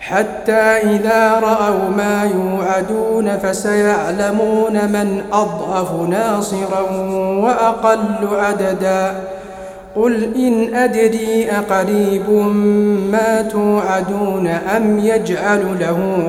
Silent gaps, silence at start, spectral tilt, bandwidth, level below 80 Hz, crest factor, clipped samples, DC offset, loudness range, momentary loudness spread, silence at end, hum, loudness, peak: none; 0 s; -6 dB/octave; 16 kHz; -48 dBFS; 14 dB; under 0.1%; under 0.1%; 2 LU; 5 LU; 0 s; none; -15 LUFS; 0 dBFS